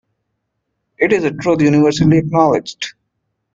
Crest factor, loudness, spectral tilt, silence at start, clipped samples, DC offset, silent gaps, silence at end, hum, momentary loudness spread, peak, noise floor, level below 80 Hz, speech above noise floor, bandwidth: 14 dB; -14 LUFS; -6.5 dB/octave; 1 s; under 0.1%; under 0.1%; none; 0.65 s; none; 13 LU; -2 dBFS; -72 dBFS; -48 dBFS; 59 dB; 7.6 kHz